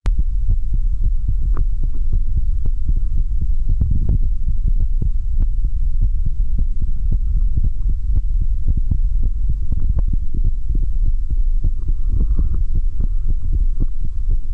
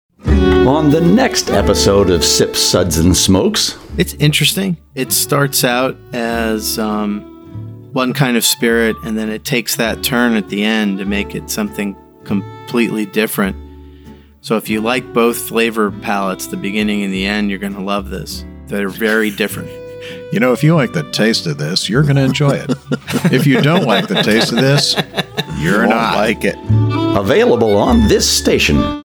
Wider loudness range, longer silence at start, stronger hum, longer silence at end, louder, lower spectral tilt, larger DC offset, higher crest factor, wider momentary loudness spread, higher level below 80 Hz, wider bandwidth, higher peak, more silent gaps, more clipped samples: second, 1 LU vs 6 LU; second, 0 s vs 0.25 s; neither; about the same, 0 s vs 0.05 s; second, -23 LUFS vs -14 LUFS; first, -10 dB/octave vs -4.5 dB/octave; first, 4% vs under 0.1%; second, 8 dB vs 14 dB; second, 3 LU vs 10 LU; first, -16 dBFS vs -30 dBFS; second, 1.3 kHz vs over 20 kHz; second, -6 dBFS vs -2 dBFS; neither; neither